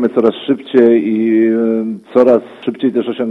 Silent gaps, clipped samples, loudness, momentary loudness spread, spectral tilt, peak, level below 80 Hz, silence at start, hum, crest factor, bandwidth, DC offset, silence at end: none; under 0.1%; -13 LUFS; 8 LU; -8.5 dB/octave; 0 dBFS; -60 dBFS; 0 s; none; 12 dB; 4.5 kHz; under 0.1%; 0 s